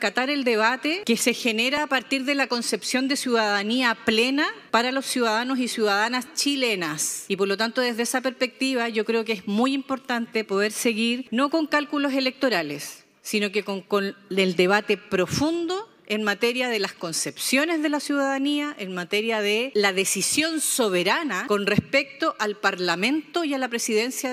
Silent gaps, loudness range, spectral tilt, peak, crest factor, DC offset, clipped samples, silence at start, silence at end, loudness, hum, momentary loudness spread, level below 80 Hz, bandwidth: none; 2 LU; -3 dB/octave; -4 dBFS; 20 dB; under 0.1%; under 0.1%; 0 s; 0 s; -23 LUFS; none; 5 LU; -70 dBFS; 16 kHz